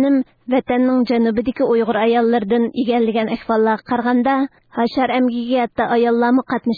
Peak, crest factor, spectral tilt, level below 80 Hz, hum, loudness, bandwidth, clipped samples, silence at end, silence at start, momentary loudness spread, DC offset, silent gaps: -4 dBFS; 12 dB; -8.5 dB/octave; -52 dBFS; none; -17 LUFS; 4.9 kHz; under 0.1%; 0 s; 0 s; 5 LU; under 0.1%; none